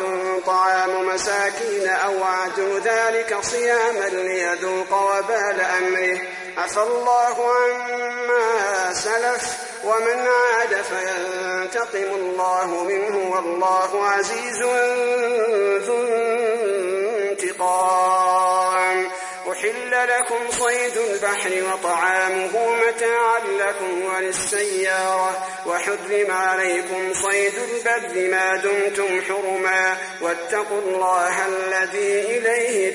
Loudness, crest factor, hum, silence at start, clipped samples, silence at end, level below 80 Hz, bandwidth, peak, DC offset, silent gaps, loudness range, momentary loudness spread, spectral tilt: -20 LUFS; 14 dB; none; 0 s; under 0.1%; 0 s; -64 dBFS; 11.5 kHz; -8 dBFS; under 0.1%; none; 1 LU; 6 LU; -1.5 dB/octave